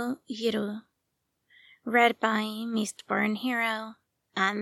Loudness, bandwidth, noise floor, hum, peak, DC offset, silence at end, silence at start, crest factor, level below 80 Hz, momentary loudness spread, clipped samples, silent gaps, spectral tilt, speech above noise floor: -28 LUFS; 14 kHz; -80 dBFS; none; -8 dBFS; under 0.1%; 0 s; 0 s; 22 dB; -78 dBFS; 14 LU; under 0.1%; none; -4 dB/octave; 52 dB